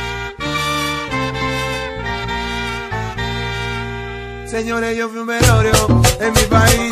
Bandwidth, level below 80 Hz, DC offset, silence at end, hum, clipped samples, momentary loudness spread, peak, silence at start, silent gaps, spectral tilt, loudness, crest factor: 15 kHz; -28 dBFS; under 0.1%; 0 s; none; under 0.1%; 12 LU; 0 dBFS; 0 s; none; -4 dB/octave; -17 LUFS; 18 dB